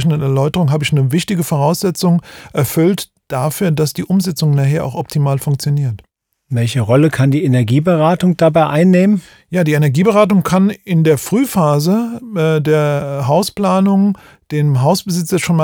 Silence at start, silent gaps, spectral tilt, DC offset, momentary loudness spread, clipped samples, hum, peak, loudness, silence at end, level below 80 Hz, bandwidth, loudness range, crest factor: 0 s; none; -6.5 dB/octave; under 0.1%; 7 LU; under 0.1%; none; 0 dBFS; -14 LUFS; 0 s; -50 dBFS; 19 kHz; 4 LU; 14 dB